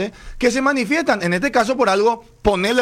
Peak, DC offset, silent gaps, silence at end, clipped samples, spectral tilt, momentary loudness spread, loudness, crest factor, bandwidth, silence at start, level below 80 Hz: -4 dBFS; under 0.1%; none; 0 s; under 0.1%; -4.5 dB/octave; 4 LU; -18 LUFS; 14 dB; 15.5 kHz; 0 s; -38 dBFS